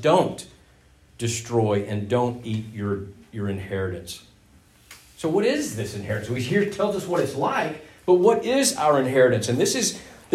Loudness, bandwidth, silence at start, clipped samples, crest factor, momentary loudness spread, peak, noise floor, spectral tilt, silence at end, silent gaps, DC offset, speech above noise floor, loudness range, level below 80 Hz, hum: -23 LUFS; 16 kHz; 0 s; under 0.1%; 18 dB; 13 LU; -4 dBFS; -55 dBFS; -4.5 dB/octave; 0 s; none; under 0.1%; 32 dB; 8 LU; -58 dBFS; none